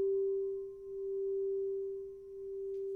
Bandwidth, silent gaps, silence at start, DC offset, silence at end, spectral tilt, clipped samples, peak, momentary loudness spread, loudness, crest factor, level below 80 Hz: 1.1 kHz; none; 0 s; under 0.1%; 0 s; -9.5 dB/octave; under 0.1%; -28 dBFS; 10 LU; -38 LUFS; 8 dB; -70 dBFS